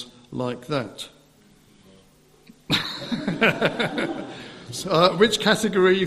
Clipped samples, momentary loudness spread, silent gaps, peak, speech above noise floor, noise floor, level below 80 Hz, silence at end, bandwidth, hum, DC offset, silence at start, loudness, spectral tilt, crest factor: under 0.1%; 17 LU; none; -2 dBFS; 33 dB; -55 dBFS; -58 dBFS; 0 s; 14.5 kHz; none; under 0.1%; 0 s; -22 LUFS; -4.5 dB/octave; 22 dB